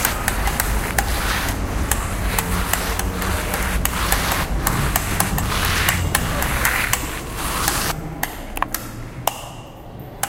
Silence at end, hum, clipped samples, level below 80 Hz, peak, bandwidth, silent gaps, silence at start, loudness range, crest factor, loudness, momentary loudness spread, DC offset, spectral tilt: 0 s; none; under 0.1%; -26 dBFS; 0 dBFS; 17 kHz; none; 0 s; 3 LU; 22 dB; -21 LUFS; 9 LU; under 0.1%; -3 dB/octave